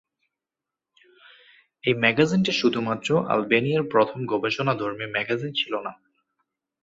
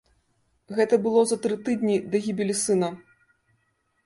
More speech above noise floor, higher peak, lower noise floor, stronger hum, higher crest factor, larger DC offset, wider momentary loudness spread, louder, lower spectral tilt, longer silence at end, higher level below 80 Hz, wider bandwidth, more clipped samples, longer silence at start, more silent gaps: first, 65 dB vs 48 dB; first, -4 dBFS vs -8 dBFS; first, -88 dBFS vs -71 dBFS; neither; about the same, 22 dB vs 18 dB; neither; about the same, 7 LU vs 8 LU; about the same, -23 LUFS vs -24 LUFS; about the same, -5.5 dB/octave vs -5 dB/octave; second, 0.9 s vs 1.05 s; about the same, -64 dBFS vs -68 dBFS; second, 7.8 kHz vs 11.5 kHz; neither; first, 1.85 s vs 0.7 s; neither